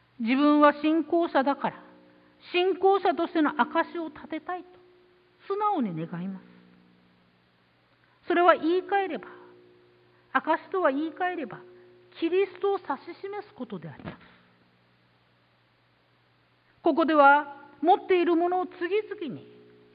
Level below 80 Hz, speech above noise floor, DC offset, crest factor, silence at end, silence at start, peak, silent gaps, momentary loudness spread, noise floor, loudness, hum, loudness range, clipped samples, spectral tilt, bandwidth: -72 dBFS; 40 dB; under 0.1%; 22 dB; 0.55 s; 0.2 s; -6 dBFS; none; 18 LU; -65 dBFS; -26 LUFS; none; 10 LU; under 0.1%; -9.5 dB/octave; 5.2 kHz